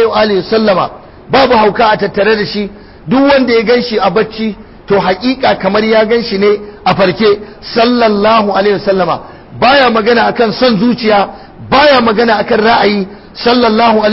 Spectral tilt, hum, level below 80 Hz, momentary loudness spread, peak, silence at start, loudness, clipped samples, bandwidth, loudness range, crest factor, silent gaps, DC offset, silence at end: -8 dB/octave; none; -40 dBFS; 9 LU; 0 dBFS; 0 s; -10 LUFS; under 0.1%; 5.8 kHz; 2 LU; 10 dB; none; under 0.1%; 0 s